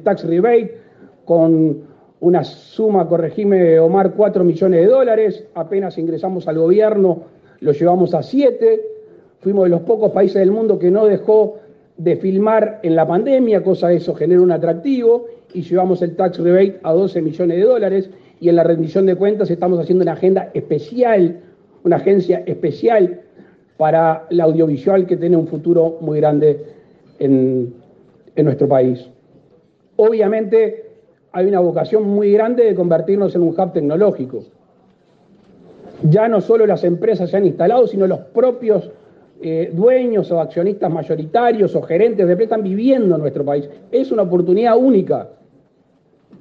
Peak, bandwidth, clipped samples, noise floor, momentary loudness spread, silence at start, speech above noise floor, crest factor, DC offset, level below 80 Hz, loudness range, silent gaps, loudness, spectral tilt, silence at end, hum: -2 dBFS; 5.4 kHz; under 0.1%; -56 dBFS; 8 LU; 0.05 s; 42 dB; 14 dB; under 0.1%; -64 dBFS; 3 LU; none; -15 LUFS; -10 dB/octave; 1.15 s; none